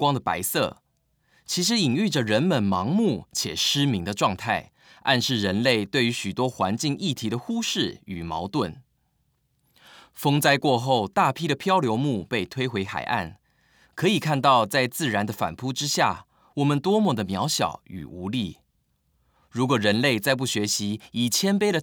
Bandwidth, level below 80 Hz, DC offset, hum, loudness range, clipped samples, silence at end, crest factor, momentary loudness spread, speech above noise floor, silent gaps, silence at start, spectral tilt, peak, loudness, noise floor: over 20 kHz; -62 dBFS; under 0.1%; none; 3 LU; under 0.1%; 0 s; 20 dB; 8 LU; 46 dB; none; 0 s; -4.5 dB/octave; -6 dBFS; -24 LUFS; -70 dBFS